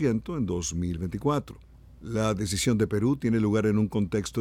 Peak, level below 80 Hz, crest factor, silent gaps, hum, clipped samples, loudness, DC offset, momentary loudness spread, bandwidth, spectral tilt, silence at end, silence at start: -12 dBFS; -46 dBFS; 14 dB; none; none; under 0.1%; -27 LUFS; under 0.1%; 7 LU; 16 kHz; -6 dB/octave; 0 s; 0 s